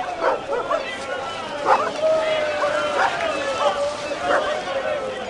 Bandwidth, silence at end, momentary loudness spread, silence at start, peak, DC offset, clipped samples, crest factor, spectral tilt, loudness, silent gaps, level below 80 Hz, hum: 11.5 kHz; 0 s; 6 LU; 0 s; -2 dBFS; under 0.1%; under 0.1%; 20 dB; -3 dB/octave; -22 LUFS; none; -56 dBFS; none